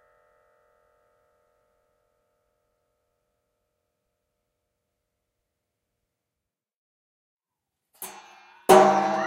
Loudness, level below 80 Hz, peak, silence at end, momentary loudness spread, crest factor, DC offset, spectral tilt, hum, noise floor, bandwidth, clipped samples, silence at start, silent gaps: -18 LUFS; -68 dBFS; -2 dBFS; 0 s; 24 LU; 26 dB; under 0.1%; -4.5 dB/octave; none; -87 dBFS; 16 kHz; under 0.1%; 8 s; none